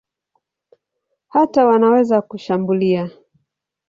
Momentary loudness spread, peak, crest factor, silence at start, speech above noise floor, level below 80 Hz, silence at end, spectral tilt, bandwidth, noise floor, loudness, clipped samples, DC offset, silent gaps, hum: 9 LU; -2 dBFS; 16 dB; 1.35 s; 59 dB; -62 dBFS; 0.8 s; -8.5 dB/octave; 7.4 kHz; -74 dBFS; -16 LUFS; under 0.1%; under 0.1%; none; none